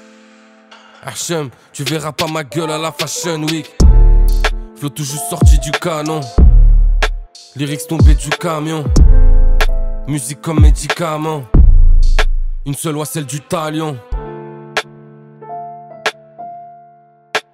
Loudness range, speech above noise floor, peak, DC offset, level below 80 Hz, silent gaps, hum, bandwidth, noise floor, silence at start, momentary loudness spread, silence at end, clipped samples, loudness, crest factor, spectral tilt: 9 LU; 32 dB; 0 dBFS; under 0.1%; -12 dBFS; none; none; 15 kHz; -46 dBFS; 1.05 s; 17 LU; 0.15 s; under 0.1%; -16 LUFS; 12 dB; -5 dB/octave